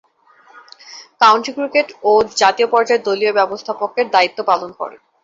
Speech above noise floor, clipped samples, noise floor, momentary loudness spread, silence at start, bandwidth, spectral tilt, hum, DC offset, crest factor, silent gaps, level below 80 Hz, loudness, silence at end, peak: 35 dB; under 0.1%; -50 dBFS; 17 LU; 0.9 s; 7.8 kHz; -2.5 dB/octave; none; under 0.1%; 16 dB; none; -60 dBFS; -15 LUFS; 0.35 s; 0 dBFS